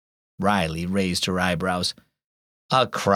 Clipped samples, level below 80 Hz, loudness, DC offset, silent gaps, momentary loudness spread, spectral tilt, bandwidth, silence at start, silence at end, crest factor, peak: under 0.1%; -50 dBFS; -23 LUFS; under 0.1%; 2.24-2.69 s; 5 LU; -4.5 dB/octave; 16 kHz; 0.4 s; 0 s; 18 dB; -6 dBFS